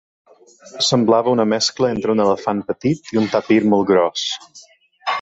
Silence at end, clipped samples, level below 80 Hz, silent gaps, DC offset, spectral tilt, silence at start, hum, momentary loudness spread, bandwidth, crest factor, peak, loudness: 0 s; under 0.1%; -58 dBFS; none; under 0.1%; -4.5 dB/octave; 0.65 s; none; 8 LU; 8.2 kHz; 16 dB; -2 dBFS; -17 LUFS